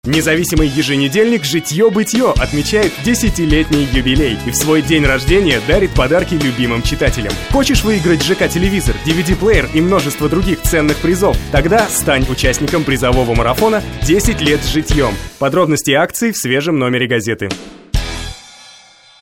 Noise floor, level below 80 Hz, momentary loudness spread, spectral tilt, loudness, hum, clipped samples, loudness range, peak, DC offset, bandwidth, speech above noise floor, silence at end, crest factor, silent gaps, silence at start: -43 dBFS; -22 dBFS; 4 LU; -4.5 dB/octave; -14 LUFS; none; under 0.1%; 2 LU; 0 dBFS; under 0.1%; 17 kHz; 30 dB; 0.75 s; 14 dB; none; 0.05 s